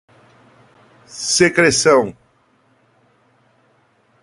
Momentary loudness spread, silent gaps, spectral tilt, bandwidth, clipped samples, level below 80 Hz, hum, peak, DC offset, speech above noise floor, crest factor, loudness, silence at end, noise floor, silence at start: 15 LU; none; -3 dB/octave; 11.5 kHz; under 0.1%; -54 dBFS; none; 0 dBFS; under 0.1%; 44 dB; 20 dB; -14 LUFS; 2.1 s; -58 dBFS; 1.15 s